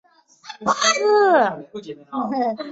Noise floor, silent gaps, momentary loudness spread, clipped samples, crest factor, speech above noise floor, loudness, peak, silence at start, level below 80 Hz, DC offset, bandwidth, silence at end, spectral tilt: -42 dBFS; none; 20 LU; under 0.1%; 16 dB; 23 dB; -19 LUFS; -4 dBFS; 0.45 s; -66 dBFS; under 0.1%; 8 kHz; 0 s; -2 dB/octave